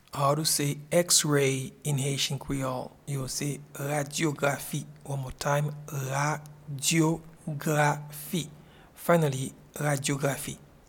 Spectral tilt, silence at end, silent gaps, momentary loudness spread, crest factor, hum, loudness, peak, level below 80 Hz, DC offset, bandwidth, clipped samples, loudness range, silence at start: -4 dB/octave; 0.25 s; none; 12 LU; 22 dB; none; -28 LUFS; -8 dBFS; -58 dBFS; under 0.1%; 18.5 kHz; under 0.1%; 4 LU; 0.15 s